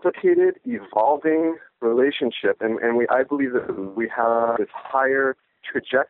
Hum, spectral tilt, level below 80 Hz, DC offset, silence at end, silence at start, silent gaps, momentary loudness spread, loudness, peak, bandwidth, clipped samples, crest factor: none; -3 dB/octave; -68 dBFS; under 0.1%; 0.05 s; 0.05 s; none; 7 LU; -22 LUFS; -6 dBFS; 4.1 kHz; under 0.1%; 16 dB